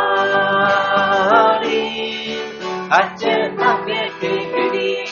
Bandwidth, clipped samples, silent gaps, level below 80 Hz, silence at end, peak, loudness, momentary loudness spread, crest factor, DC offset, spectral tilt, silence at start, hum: 7.2 kHz; under 0.1%; none; -58 dBFS; 0 s; 0 dBFS; -17 LUFS; 10 LU; 18 dB; under 0.1%; -1 dB/octave; 0 s; none